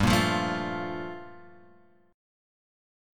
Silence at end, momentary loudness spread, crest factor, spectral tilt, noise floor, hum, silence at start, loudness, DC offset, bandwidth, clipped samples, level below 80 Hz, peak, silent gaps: 1 s; 20 LU; 22 dB; -5 dB/octave; -60 dBFS; none; 0 s; -29 LUFS; under 0.1%; 17.5 kHz; under 0.1%; -48 dBFS; -8 dBFS; none